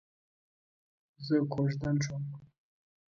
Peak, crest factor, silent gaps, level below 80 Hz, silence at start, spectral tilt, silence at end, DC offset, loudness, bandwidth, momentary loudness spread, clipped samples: -16 dBFS; 18 dB; none; -64 dBFS; 1.2 s; -7 dB/octave; 0.6 s; under 0.1%; -32 LUFS; 7.4 kHz; 15 LU; under 0.1%